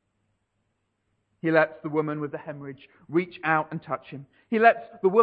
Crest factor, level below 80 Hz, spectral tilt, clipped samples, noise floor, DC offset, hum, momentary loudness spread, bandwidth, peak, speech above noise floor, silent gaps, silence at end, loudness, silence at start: 20 dB; -74 dBFS; -9 dB/octave; under 0.1%; -75 dBFS; under 0.1%; none; 19 LU; 5 kHz; -6 dBFS; 50 dB; none; 0 s; -25 LUFS; 1.45 s